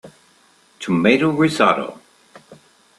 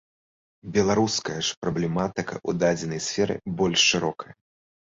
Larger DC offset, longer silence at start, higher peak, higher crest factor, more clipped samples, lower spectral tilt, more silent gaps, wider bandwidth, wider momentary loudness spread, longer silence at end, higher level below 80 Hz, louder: neither; second, 0.05 s vs 0.65 s; first, 0 dBFS vs -8 dBFS; about the same, 20 dB vs 18 dB; neither; first, -6 dB/octave vs -3.5 dB/octave; second, none vs 1.57-1.62 s; first, 12.5 kHz vs 8 kHz; first, 14 LU vs 11 LU; about the same, 0.45 s vs 0.55 s; second, -60 dBFS vs -54 dBFS; first, -17 LUFS vs -24 LUFS